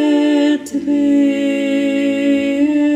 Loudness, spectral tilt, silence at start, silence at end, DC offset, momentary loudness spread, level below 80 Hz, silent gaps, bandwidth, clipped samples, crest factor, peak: -15 LUFS; -4.5 dB/octave; 0 s; 0 s; under 0.1%; 3 LU; -56 dBFS; none; 10 kHz; under 0.1%; 10 dB; -4 dBFS